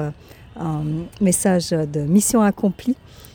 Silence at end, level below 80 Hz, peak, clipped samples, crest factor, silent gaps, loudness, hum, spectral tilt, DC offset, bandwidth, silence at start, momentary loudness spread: 0.05 s; -46 dBFS; -4 dBFS; under 0.1%; 16 dB; none; -20 LUFS; none; -5.5 dB/octave; under 0.1%; over 20 kHz; 0 s; 11 LU